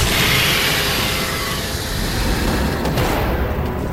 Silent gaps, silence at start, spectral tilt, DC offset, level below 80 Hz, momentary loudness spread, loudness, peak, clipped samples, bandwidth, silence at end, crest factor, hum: none; 0 s; -3.5 dB/octave; under 0.1%; -26 dBFS; 8 LU; -18 LUFS; -4 dBFS; under 0.1%; 16.5 kHz; 0 s; 14 dB; none